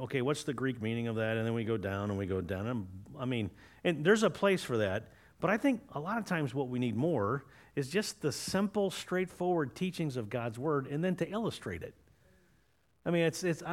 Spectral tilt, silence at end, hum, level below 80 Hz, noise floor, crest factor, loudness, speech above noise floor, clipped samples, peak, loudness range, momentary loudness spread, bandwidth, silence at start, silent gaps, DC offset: -5.5 dB/octave; 0 s; none; -66 dBFS; -72 dBFS; 20 dB; -34 LUFS; 38 dB; under 0.1%; -14 dBFS; 4 LU; 9 LU; 16.5 kHz; 0 s; none; under 0.1%